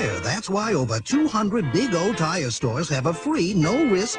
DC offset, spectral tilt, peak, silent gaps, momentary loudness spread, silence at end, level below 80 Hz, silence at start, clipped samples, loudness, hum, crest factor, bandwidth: under 0.1%; -5 dB/octave; -8 dBFS; none; 4 LU; 0 s; -50 dBFS; 0 s; under 0.1%; -22 LUFS; none; 14 dB; 10.5 kHz